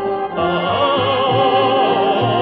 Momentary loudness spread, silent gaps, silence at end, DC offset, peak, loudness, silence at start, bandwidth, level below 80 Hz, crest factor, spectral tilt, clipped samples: 5 LU; none; 0 s; under 0.1%; -4 dBFS; -16 LUFS; 0 s; 5.6 kHz; -52 dBFS; 12 dB; -3 dB/octave; under 0.1%